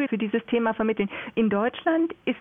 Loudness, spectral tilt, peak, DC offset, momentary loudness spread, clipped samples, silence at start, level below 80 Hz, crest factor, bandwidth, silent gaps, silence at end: -25 LUFS; -9.5 dB/octave; -12 dBFS; under 0.1%; 4 LU; under 0.1%; 0 s; -62 dBFS; 12 dB; 3.8 kHz; none; 0 s